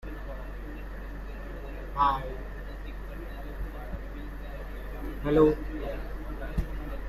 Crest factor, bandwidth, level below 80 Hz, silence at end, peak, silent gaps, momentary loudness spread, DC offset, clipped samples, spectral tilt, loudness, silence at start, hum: 22 dB; 13.5 kHz; -38 dBFS; 0 s; -10 dBFS; none; 16 LU; under 0.1%; under 0.1%; -8 dB/octave; -33 LUFS; 0 s; none